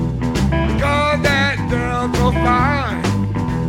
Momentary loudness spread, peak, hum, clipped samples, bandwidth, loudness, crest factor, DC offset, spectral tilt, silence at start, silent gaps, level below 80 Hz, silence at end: 4 LU; -2 dBFS; none; under 0.1%; 16.5 kHz; -17 LUFS; 14 dB; under 0.1%; -6 dB/octave; 0 s; none; -26 dBFS; 0 s